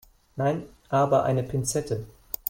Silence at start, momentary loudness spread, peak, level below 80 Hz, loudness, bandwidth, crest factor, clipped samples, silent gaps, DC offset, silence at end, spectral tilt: 0.35 s; 12 LU; -8 dBFS; -52 dBFS; -26 LUFS; 16.5 kHz; 20 dB; under 0.1%; none; under 0.1%; 0.4 s; -6 dB/octave